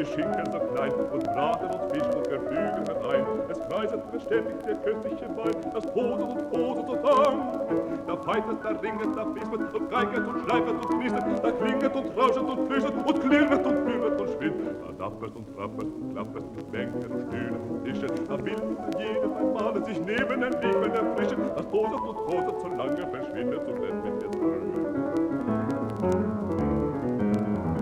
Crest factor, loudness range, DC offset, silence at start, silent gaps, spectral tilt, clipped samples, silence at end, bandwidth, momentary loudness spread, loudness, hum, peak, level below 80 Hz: 18 dB; 6 LU; under 0.1%; 0 s; none; -7 dB/octave; under 0.1%; 0 s; 12.5 kHz; 7 LU; -28 LUFS; none; -10 dBFS; -54 dBFS